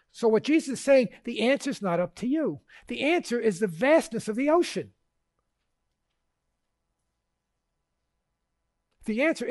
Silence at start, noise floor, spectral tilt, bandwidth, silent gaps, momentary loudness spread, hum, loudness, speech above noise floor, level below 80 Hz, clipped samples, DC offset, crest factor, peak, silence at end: 0.15 s; -81 dBFS; -5 dB/octave; 11.5 kHz; none; 10 LU; none; -26 LUFS; 55 dB; -66 dBFS; under 0.1%; under 0.1%; 18 dB; -10 dBFS; 0 s